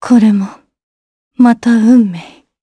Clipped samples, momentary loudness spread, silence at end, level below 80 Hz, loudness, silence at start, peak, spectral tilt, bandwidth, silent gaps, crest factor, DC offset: under 0.1%; 13 LU; 0.4 s; -58 dBFS; -10 LUFS; 0 s; 0 dBFS; -7 dB/octave; 10 kHz; 0.83-1.31 s; 12 dB; under 0.1%